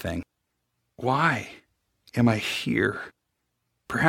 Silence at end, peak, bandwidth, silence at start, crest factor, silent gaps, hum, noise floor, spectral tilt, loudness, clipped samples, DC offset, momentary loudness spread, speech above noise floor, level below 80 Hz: 0 s; -4 dBFS; 16.5 kHz; 0 s; 24 dB; none; none; -78 dBFS; -5.5 dB/octave; -26 LUFS; under 0.1%; under 0.1%; 14 LU; 53 dB; -56 dBFS